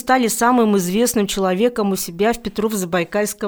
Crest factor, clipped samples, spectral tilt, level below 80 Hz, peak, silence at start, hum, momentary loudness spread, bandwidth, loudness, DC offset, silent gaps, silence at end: 14 dB; under 0.1%; -4.5 dB/octave; -46 dBFS; -2 dBFS; 0.05 s; none; 6 LU; over 20 kHz; -18 LUFS; under 0.1%; none; 0 s